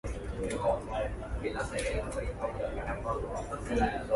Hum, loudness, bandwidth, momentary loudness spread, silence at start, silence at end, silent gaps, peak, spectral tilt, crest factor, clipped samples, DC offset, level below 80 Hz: none; -34 LUFS; 11.5 kHz; 6 LU; 0.05 s; 0 s; none; -18 dBFS; -5.5 dB/octave; 16 dB; under 0.1%; under 0.1%; -40 dBFS